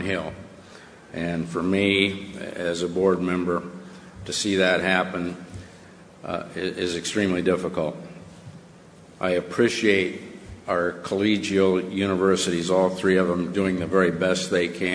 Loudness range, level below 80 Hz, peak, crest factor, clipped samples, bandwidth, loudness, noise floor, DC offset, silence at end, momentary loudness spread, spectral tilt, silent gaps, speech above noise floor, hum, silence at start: 5 LU; -56 dBFS; -4 dBFS; 20 dB; under 0.1%; 10.5 kHz; -23 LUFS; -48 dBFS; under 0.1%; 0 s; 19 LU; -5 dB/octave; none; 25 dB; none; 0 s